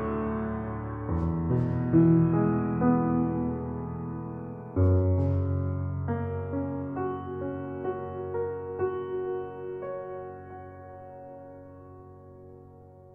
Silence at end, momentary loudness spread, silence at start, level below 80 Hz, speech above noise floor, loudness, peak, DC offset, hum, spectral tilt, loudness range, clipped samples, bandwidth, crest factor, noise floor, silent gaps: 0 s; 21 LU; 0 s; -48 dBFS; 27 dB; -29 LUFS; -10 dBFS; under 0.1%; none; -12.5 dB/octave; 13 LU; under 0.1%; 3.2 kHz; 18 dB; -50 dBFS; none